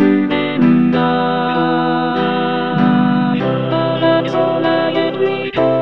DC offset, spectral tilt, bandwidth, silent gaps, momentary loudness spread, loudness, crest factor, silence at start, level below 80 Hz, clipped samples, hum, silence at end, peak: 0.7%; -8.5 dB/octave; 6 kHz; none; 4 LU; -15 LUFS; 14 dB; 0 s; -52 dBFS; under 0.1%; none; 0 s; 0 dBFS